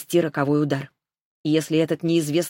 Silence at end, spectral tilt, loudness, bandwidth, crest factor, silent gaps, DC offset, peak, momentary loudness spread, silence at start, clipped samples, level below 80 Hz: 0 s; -6 dB/octave; -23 LUFS; 17 kHz; 16 dB; 1.21-1.44 s; under 0.1%; -6 dBFS; 8 LU; 0 s; under 0.1%; -68 dBFS